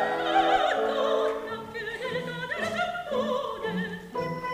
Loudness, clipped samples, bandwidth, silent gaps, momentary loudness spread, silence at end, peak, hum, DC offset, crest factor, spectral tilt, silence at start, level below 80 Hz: -28 LUFS; under 0.1%; 15.5 kHz; none; 10 LU; 0 s; -10 dBFS; none; under 0.1%; 18 dB; -5 dB/octave; 0 s; -60 dBFS